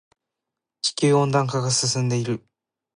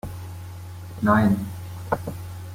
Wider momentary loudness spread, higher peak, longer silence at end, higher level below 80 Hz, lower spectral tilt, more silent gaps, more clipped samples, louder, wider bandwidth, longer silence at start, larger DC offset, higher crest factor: second, 8 LU vs 19 LU; about the same, -8 dBFS vs -6 dBFS; first, 0.6 s vs 0 s; second, -66 dBFS vs -48 dBFS; second, -4.5 dB/octave vs -7.5 dB/octave; neither; neither; about the same, -22 LUFS vs -24 LUFS; second, 11 kHz vs 16.5 kHz; first, 0.85 s vs 0.05 s; neither; about the same, 16 dB vs 20 dB